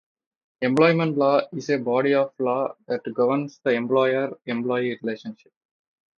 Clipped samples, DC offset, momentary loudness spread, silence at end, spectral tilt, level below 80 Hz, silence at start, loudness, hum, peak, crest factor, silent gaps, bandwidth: under 0.1%; under 0.1%; 10 LU; 0.85 s; -7 dB/octave; -72 dBFS; 0.6 s; -23 LUFS; none; -4 dBFS; 20 dB; none; 10.5 kHz